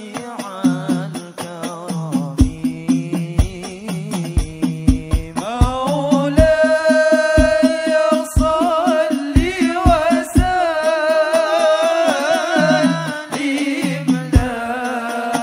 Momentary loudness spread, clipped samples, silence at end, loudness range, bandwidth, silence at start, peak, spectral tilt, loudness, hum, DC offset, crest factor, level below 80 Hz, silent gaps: 11 LU; under 0.1%; 0 s; 6 LU; 16 kHz; 0 s; 0 dBFS; -6 dB/octave; -17 LUFS; none; under 0.1%; 16 dB; -26 dBFS; none